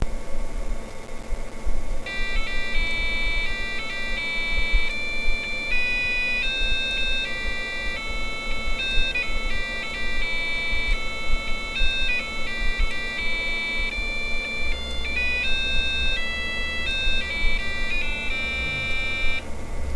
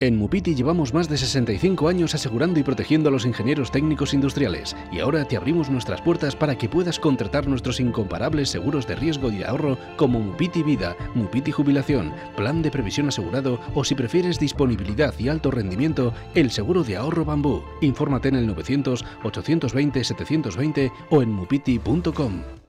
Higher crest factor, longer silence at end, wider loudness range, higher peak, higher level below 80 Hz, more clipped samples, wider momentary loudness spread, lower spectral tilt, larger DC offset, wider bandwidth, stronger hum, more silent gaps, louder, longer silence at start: about the same, 16 dB vs 14 dB; about the same, 0 s vs 0.1 s; about the same, 3 LU vs 2 LU; about the same, -8 dBFS vs -8 dBFS; first, -28 dBFS vs -40 dBFS; neither; first, 10 LU vs 4 LU; second, -3 dB/octave vs -6 dB/octave; first, 0.3% vs under 0.1%; second, 11 kHz vs 13 kHz; neither; neither; about the same, -25 LUFS vs -23 LUFS; about the same, 0 s vs 0 s